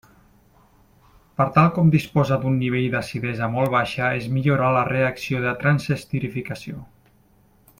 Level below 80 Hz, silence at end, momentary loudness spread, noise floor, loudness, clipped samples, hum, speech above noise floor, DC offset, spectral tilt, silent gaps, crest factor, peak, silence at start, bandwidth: -52 dBFS; 0.95 s; 12 LU; -57 dBFS; -21 LUFS; under 0.1%; none; 36 dB; under 0.1%; -7.5 dB/octave; none; 20 dB; -2 dBFS; 1.4 s; 15.5 kHz